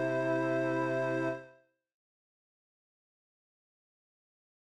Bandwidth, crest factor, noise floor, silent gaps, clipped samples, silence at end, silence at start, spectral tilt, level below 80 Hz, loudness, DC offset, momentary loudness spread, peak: 10 kHz; 16 dB; -62 dBFS; none; under 0.1%; 3.25 s; 0 s; -7.5 dB/octave; -84 dBFS; -32 LUFS; under 0.1%; 5 LU; -20 dBFS